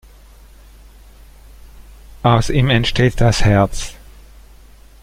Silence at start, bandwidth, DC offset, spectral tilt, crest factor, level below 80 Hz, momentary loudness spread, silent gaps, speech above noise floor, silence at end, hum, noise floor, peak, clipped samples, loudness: 1.75 s; 15 kHz; under 0.1%; -5.5 dB/octave; 18 dB; -28 dBFS; 7 LU; none; 29 dB; 1.1 s; none; -43 dBFS; -2 dBFS; under 0.1%; -15 LUFS